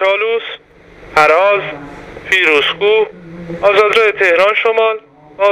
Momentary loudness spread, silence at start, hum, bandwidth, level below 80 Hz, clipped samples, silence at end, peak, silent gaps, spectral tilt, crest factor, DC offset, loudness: 19 LU; 0 s; none; 13 kHz; -48 dBFS; under 0.1%; 0 s; 0 dBFS; none; -3.5 dB/octave; 14 dB; under 0.1%; -12 LUFS